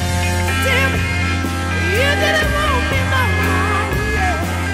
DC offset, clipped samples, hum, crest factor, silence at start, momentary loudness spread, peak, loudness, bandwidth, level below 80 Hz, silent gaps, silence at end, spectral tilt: under 0.1%; under 0.1%; none; 12 dB; 0 s; 4 LU; -4 dBFS; -16 LUFS; 16 kHz; -26 dBFS; none; 0 s; -4.5 dB/octave